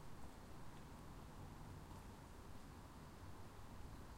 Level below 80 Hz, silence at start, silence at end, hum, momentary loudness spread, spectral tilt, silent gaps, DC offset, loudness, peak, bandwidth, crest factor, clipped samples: -62 dBFS; 0 s; 0 s; none; 2 LU; -5.5 dB/octave; none; under 0.1%; -59 LUFS; -42 dBFS; 16 kHz; 12 dB; under 0.1%